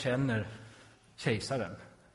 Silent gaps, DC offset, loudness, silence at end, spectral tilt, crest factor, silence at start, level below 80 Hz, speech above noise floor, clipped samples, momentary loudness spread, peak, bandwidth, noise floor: none; under 0.1%; -35 LUFS; 0.25 s; -6 dB/octave; 18 dB; 0 s; -62 dBFS; 25 dB; under 0.1%; 21 LU; -16 dBFS; 11.5 kHz; -58 dBFS